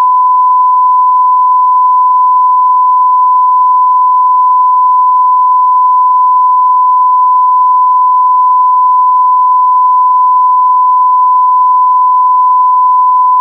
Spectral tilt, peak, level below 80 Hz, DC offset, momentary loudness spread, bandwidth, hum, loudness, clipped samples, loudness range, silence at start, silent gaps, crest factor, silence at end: -3 dB/octave; -2 dBFS; under -90 dBFS; under 0.1%; 0 LU; 1.2 kHz; none; -7 LUFS; under 0.1%; 0 LU; 0 s; none; 4 dB; 0 s